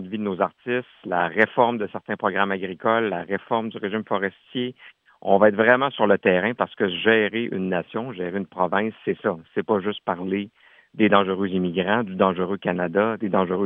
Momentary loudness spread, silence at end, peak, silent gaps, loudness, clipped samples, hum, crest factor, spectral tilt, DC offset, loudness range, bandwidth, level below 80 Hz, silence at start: 11 LU; 0 s; -2 dBFS; none; -23 LUFS; under 0.1%; none; 20 dB; -9 dB/octave; under 0.1%; 5 LU; 3.9 kHz; -70 dBFS; 0 s